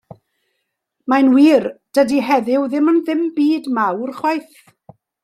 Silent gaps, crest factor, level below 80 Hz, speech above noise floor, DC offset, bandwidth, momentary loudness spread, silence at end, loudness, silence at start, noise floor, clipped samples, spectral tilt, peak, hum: none; 14 dB; -66 dBFS; 58 dB; under 0.1%; 13.5 kHz; 9 LU; 0.8 s; -16 LUFS; 1.05 s; -73 dBFS; under 0.1%; -5.5 dB/octave; -2 dBFS; none